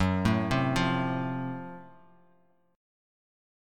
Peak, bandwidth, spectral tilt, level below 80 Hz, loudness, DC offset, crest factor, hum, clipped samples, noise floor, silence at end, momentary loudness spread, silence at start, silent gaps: -12 dBFS; 14 kHz; -6.5 dB/octave; -50 dBFS; -29 LUFS; under 0.1%; 20 dB; none; under 0.1%; -67 dBFS; 1.85 s; 15 LU; 0 s; none